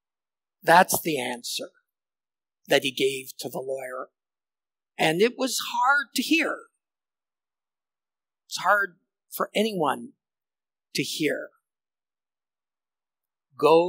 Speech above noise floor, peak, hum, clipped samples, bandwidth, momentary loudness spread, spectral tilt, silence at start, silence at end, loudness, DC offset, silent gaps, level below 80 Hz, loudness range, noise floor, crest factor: over 66 dB; -4 dBFS; none; under 0.1%; 16 kHz; 16 LU; -3 dB/octave; 0.65 s; 0 s; -25 LUFS; under 0.1%; none; -78 dBFS; 6 LU; under -90 dBFS; 24 dB